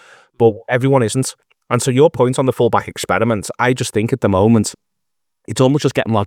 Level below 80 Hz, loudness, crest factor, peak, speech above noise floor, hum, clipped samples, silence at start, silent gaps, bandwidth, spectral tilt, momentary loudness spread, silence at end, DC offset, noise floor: -54 dBFS; -16 LUFS; 16 dB; 0 dBFS; 64 dB; none; under 0.1%; 0.4 s; none; 16.5 kHz; -5.5 dB/octave; 7 LU; 0 s; under 0.1%; -79 dBFS